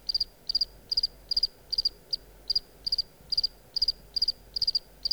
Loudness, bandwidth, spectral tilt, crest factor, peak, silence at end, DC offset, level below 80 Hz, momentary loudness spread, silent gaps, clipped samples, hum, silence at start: -28 LUFS; over 20 kHz; -1 dB/octave; 18 dB; -14 dBFS; 0 s; under 0.1%; -52 dBFS; 3 LU; none; under 0.1%; none; 0.05 s